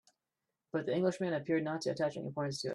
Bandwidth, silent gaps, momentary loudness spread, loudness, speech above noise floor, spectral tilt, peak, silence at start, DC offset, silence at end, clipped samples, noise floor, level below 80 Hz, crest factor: 12 kHz; none; 6 LU; -36 LUFS; 54 dB; -6 dB/octave; -20 dBFS; 0.75 s; under 0.1%; 0 s; under 0.1%; -89 dBFS; -76 dBFS; 16 dB